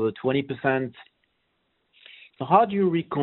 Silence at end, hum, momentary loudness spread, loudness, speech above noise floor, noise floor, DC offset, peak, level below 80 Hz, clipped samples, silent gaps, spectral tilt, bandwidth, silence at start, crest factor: 0 s; none; 11 LU; -23 LUFS; 49 dB; -73 dBFS; under 0.1%; -4 dBFS; -66 dBFS; under 0.1%; none; -5.5 dB/octave; 4.2 kHz; 0 s; 22 dB